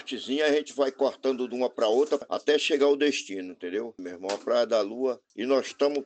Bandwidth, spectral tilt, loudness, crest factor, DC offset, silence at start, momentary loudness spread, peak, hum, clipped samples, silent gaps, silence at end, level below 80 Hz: 8.8 kHz; -3 dB/octave; -27 LUFS; 16 dB; under 0.1%; 0 s; 11 LU; -10 dBFS; none; under 0.1%; none; 0 s; -82 dBFS